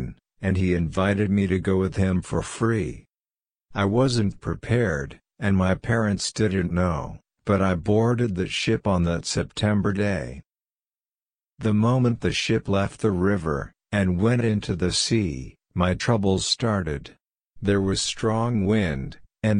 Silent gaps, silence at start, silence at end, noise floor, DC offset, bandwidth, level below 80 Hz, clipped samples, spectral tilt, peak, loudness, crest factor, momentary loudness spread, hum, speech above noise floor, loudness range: none; 0 s; 0 s; under -90 dBFS; under 0.1%; 10.5 kHz; -44 dBFS; under 0.1%; -5.5 dB/octave; -6 dBFS; -24 LUFS; 18 dB; 9 LU; none; over 67 dB; 2 LU